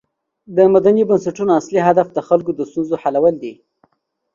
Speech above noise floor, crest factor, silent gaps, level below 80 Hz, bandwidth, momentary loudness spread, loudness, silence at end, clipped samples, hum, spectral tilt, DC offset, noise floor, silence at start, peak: 50 dB; 16 dB; none; -58 dBFS; 7.4 kHz; 10 LU; -16 LUFS; 0.8 s; under 0.1%; none; -7.5 dB/octave; under 0.1%; -65 dBFS; 0.5 s; 0 dBFS